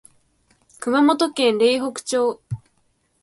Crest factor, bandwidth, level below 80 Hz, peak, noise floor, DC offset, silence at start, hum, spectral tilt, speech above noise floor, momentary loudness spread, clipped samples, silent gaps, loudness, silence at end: 16 dB; 11.5 kHz; -60 dBFS; -6 dBFS; -65 dBFS; under 0.1%; 0.8 s; none; -4.5 dB/octave; 47 dB; 16 LU; under 0.1%; none; -20 LUFS; 0.65 s